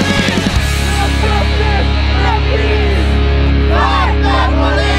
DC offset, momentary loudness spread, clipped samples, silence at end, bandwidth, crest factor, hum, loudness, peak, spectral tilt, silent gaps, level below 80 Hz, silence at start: 0.7%; 2 LU; under 0.1%; 0 s; 12.5 kHz; 10 dB; none; -13 LUFS; 0 dBFS; -5.5 dB/octave; none; -14 dBFS; 0 s